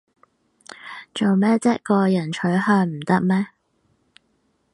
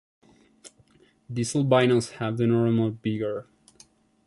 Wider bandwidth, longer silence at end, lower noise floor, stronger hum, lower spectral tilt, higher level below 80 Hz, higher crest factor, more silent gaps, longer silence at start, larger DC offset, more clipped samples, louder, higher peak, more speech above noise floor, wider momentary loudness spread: about the same, 11 kHz vs 11.5 kHz; first, 1.25 s vs 0.85 s; first, -67 dBFS vs -60 dBFS; neither; about the same, -7 dB/octave vs -6.5 dB/octave; about the same, -66 dBFS vs -62 dBFS; about the same, 18 dB vs 20 dB; neither; first, 0.85 s vs 0.65 s; neither; neither; first, -20 LUFS vs -25 LUFS; first, -4 dBFS vs -8 dBFS; first, 48 dB vs 36 dB; first, 15 LU vs 11 LU